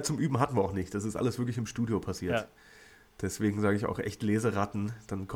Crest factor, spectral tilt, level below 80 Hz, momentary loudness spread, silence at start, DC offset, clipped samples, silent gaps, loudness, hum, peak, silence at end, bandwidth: 18 dB; -6 dB/octave; -56 dBFS; 8 LU; 0 s; under 0.1%; under 0.1%; none; -32 LUFS; none; -12 dBFS; 0 s; 17 kHz